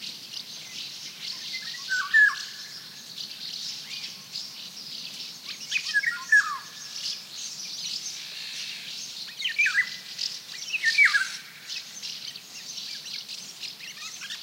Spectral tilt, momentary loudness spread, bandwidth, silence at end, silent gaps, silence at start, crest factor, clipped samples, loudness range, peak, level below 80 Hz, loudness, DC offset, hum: 2 dB/octave; 16 LU; 16 kHz; 0 s; none; 0 s; 20 dB; under 0.1%; 8 LU; -10 dBFS; under -90 dBFS; -28 LUFS; under 0.1%; none